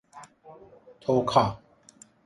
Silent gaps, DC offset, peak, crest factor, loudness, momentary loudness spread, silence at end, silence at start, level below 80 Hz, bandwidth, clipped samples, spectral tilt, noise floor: none; under 0.1%; -6 dBFS; 24 dB; -25 LUFS; 23 LU; 0.7 s; 0.15 s; -58 dBFS; 11.5 kHz; under 0.1%; -6.5 dB/octave; -56 dBFS